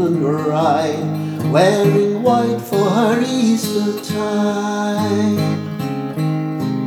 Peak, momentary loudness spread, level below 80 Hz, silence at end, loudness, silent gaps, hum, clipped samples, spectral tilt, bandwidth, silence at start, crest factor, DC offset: -2 dBFS; 7 LU; -66 dBFS; 0 s; -17 LUFS; none; none; under 0.1%; -6.5 dB/octave; 18.5 kHz; 0 s; 16 dB; under 0.1%